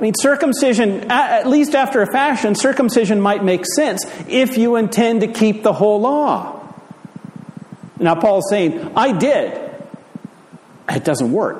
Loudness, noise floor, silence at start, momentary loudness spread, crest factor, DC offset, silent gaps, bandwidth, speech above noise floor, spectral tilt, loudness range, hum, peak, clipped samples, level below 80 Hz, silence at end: -16 LUFS; -43 dBFS; 0 s; 21 LU; 16 dB; under 0.1%; none; 15 kHz; 28 dB; -5 dB/octave; 4 LU; none; -2 dBFS; under 0.1%; -62 dBFS; 0 s